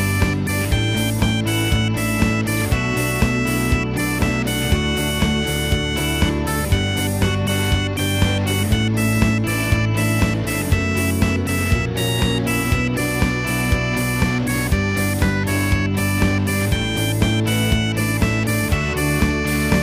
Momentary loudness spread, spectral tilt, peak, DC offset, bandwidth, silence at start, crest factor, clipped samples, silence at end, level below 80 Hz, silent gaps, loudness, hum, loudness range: 2 LU; -5 dB/octave; -2 dBFS; under 0.1%; 16 kHz; 0 s; 16 dB; under 0.1%; 0 s; -28 dBFS; none; -19 LUFS; none; 1 LU